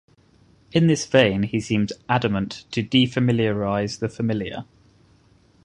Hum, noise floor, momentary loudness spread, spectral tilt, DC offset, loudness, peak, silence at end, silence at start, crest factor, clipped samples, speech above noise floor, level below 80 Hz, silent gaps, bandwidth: none; -56 dBFS; 10 LU; -6 dB/octave; under 0.1%; -22 LUFS; -2 dBFS; 1 s; 0.75 s; 22 dB; under 0.1%; 35 dB; -50 dBFS; none; 11 kHz